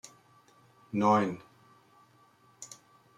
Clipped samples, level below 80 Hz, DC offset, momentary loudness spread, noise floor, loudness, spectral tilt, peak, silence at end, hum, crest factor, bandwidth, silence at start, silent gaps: under 0.1%; -78 dBFS; under 0.1%; 26 LU; -63 dBFS; -28 LUFS; -6 dB/octave; -12 dBFS; 0.5 s; none; 22 dB; 12 kHz; 0.95 s; none